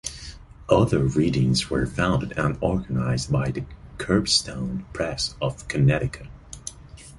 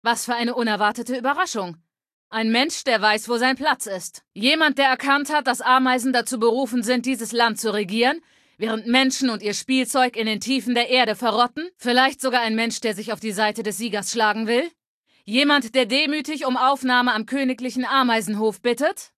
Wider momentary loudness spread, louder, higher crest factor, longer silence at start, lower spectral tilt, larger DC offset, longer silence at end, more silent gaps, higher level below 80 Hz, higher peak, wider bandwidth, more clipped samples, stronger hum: first, 18 LU vs 8 LU; about the same, -23 LUFS vs -21 LUFS; about the same, 20 dB vs 18 dB; about the same, 0.05 s vs 0.05 s; first, -5 dB/octave vs -2.5 dB/octave; neither; about the same, 0 s vs 0.1 s; second, none vs 2.13-2.31 s, 14.86-15.04 s; first, -40 dBFS vs -72 dBFS; about the same, -4 dBFS vs -2 dBFS; second, 11.5 kHz vs 14.5 kHz; neither; neither